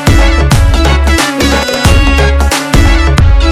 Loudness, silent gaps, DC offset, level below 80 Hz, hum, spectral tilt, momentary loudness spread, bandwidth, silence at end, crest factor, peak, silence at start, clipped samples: -9 LUFS; none; under 0.1%; -10 dBFS; none; -5 dB/octave; 2 LU; 15 kHz; 0 s; 6 dB; 0 dBFS; 0 s; 3%